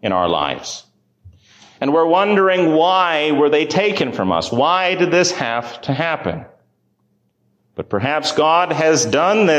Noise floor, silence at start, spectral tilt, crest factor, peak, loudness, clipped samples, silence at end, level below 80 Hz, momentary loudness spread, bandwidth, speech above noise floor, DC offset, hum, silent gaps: -64 dBFS; 0.05 s; -4 dB/octave; 14 dB; -4 dBFS; -16 LUFS; under 0.1%; 0 s; -52 dBFS; 10 LU; 10 kHz; 48 dB; under 0.1%; none; none